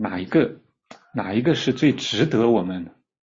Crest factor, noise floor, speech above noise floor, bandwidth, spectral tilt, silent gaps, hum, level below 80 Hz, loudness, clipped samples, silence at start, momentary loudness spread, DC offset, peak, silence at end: 16 dB; -50 dBFS; 29 dB; 7.6 kHz; -6 dB/octave; none; none; -58 dBFS; -21 LUFS; under 0.1%; 0 s; 12 LU; under 0.1%; -6 dBFS; 0.45 s